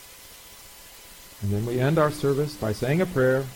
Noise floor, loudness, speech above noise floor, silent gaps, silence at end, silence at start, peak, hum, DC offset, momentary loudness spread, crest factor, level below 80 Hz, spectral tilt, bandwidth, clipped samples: -46 dBFS; -25 LUFS; 23 dB; none; 0 s; 0 s; -8 dBFS; none; under 0.1%; 22 LU; 18 dB; -50 dBFS; -6.5 dB/octave; 17.5 kHz; under 0.1%